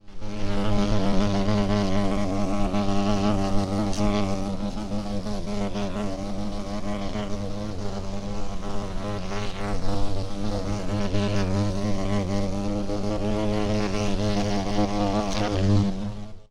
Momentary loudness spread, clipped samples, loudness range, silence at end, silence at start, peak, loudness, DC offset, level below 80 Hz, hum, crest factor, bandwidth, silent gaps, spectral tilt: 8 LU; under 0.1%; 7 LU; 0.1 s; 0.05 s; -6 dBFS; -27 LUFS; under 0.1%; -32 dBFS; none; 16 dB; 11 kHz; none; -6.5 dB/octave